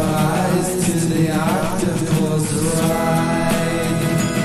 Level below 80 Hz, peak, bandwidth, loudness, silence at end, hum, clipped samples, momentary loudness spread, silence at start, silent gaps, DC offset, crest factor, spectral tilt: -40 dBFS; -4 dBFS; 15 kHz; -18 LUFS; 0 s; none; under 0.1%; 2 LU; 0 s; none; under 0.1%; 14 dB; -5.5 dB/octave